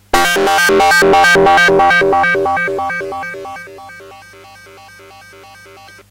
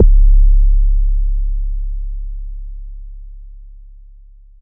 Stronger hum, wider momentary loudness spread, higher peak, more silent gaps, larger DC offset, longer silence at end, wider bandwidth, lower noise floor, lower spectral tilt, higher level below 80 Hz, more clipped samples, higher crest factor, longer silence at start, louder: first, 50 Hz at -50 dBFS vs none; second, 18 LU vs 24 LU; about the same, 0 dBFS vs 0 dBFS; neither; neither; first, 1.95 s vs 0.85 s; first, 16.5 kHz vs 0.4 kHz; about the same, -39 dBFS vs -40 dBFS; second, -3 dB/octave vs -22 dB/octave; second, -38 dBFS vs -14 dBFS; neither; about the same, 12 dB vs 12 dB; first, 0.15 s vs 0 s; first, -10 LUFS vs -18 LUFS